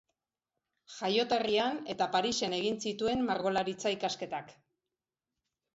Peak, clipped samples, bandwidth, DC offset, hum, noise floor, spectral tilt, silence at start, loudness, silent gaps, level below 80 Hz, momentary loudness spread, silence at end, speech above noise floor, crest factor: -16 dBFS; under 0.1%; 8 kHz; under 0.1%; none; under -90 dBFS; -3.5 dB/octave; 0.9 s; -32 LUFS; none; -68 dBFS; 9 LU; 1.25 s; over 58 dB; 18 dB